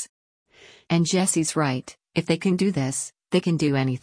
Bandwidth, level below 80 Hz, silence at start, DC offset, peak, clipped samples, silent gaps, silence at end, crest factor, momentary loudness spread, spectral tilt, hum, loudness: 10.5 kHz; -62 dBFS; 0 s; under 0.1%; -8 dBFS; under 0.1%; 0.09-0.46 s; 0.05 s; 16 dB; 9 LU; -5 dB/octave; none; -23 LUFS